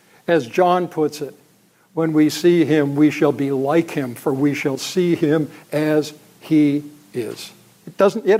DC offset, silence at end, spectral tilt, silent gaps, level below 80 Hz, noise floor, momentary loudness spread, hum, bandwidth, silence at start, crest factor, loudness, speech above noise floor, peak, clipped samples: under 0.1%; 0 s; -6 dB/octave; none; -68 dBFS; -55 dBFS; 14 LU; none; 16 kHz; 0.3 s; 16 dB; -19 LUFS; 38 dB; -2 dBFS; under 0.1%